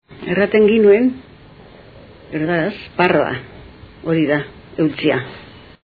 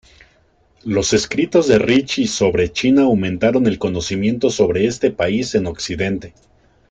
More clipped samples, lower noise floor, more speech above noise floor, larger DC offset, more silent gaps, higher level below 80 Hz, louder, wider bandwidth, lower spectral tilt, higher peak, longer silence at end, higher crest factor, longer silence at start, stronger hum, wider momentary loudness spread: neither; second, -42 dBFS vs -56 dBFS; second, 26 dB vs 40 dB; neither; neither; second, -50 dBFS vs -44 dBFS; about the same, -16 LUFS vs -17 LUFS; second, 4.9 kHz vs 9.4 kHz; first, -10 dB/octave vs -5 dB/octave; about the same, 0 dBFS vs -2 dBFS; second, 0.35 s vs 0.6 s; about the same, 18 dB vs 16 dB; second, 0.1 s vs 0.85 s; neither; first, 18 LU vs 8 LU